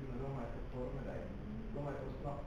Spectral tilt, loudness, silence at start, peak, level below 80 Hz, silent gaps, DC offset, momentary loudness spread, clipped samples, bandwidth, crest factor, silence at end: -8.5 dB/octave; -45 LUFS; 0 s; -30 dBFS; -50 dBFS; none; 0.1%; 3 LU; under 0.1%; 9.4 kHz; 12 dB; 0 s